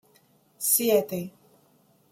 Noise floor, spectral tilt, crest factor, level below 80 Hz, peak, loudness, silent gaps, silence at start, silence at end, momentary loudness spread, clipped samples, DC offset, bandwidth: -63 dBFS; -3 dB/octave; 20 dB; -74 dBFS; -8 dBFS; -24 LUFS; none; 0.6 s; 0.85 s; 15 LU; under 0.1%; under 0.1%; 16.5 kHz